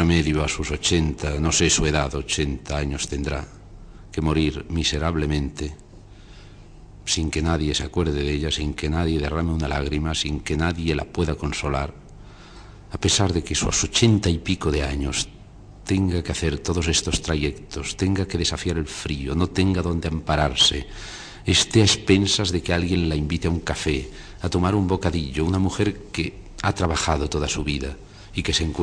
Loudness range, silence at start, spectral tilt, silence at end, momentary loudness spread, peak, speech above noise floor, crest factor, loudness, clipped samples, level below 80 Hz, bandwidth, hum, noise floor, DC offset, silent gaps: 6 LU; 0 s; -4 dB/octave; 0 s; 10 LU; -4 dBFS; 21 dB; 20 dB; -23 LUFS; under 0.1%; -32 dBFS; 10.5 kHz; none; -44 dBFS; under 0.1%; none